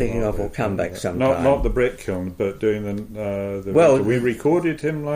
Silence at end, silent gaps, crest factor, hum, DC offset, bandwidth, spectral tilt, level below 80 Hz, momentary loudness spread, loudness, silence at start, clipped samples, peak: 0 s; none; 14 dB; none; under 0.1%; 15.5 kHz; -7 dB/octave; -34 dBFS; 11 LU; -21 LUFS; 0 s; under 0.1%; -6 dBFS